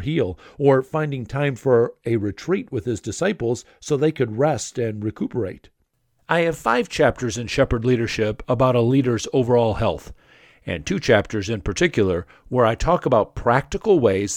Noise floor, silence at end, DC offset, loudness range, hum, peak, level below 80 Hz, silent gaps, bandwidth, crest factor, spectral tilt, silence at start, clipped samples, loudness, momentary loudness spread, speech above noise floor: -66 dBFS; 0 s; under 0.1%; 4 LU; none; -2 dBFS; -40 dBFS; none; 15.5 kHz; 20 dB; -6 dB/octave; 0 s; under 0.1%; -21 LUFS; 8 LU; 46 dB